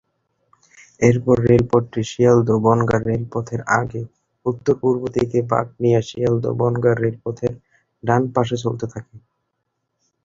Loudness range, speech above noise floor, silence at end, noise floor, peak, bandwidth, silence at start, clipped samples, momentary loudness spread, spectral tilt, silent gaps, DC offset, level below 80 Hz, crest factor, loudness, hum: 4 LU; 56 dB; 1.05 s; -75 dBFS; 0 dBFS; 7.6 kHz; 1 s; under 0.1%; 11 LU; -7.5 dB/octave; none; under 0.1%; -48 dBFS; 18 dB; -19 LUFS; none